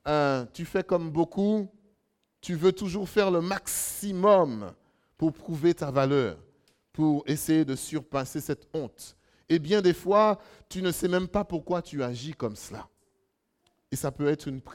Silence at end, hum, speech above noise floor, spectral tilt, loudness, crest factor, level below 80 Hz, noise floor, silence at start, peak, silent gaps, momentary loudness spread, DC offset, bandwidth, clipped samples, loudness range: 0 s; none; 48 dB; -5.5 dB/octave; -27 LUFS; 20 dB; -56 dBFS; -75 dBFS; 0.05 s; -8 dBFS; none; 14 LU; under 0.1%; 17 kHz; under 0.1%; 5 LU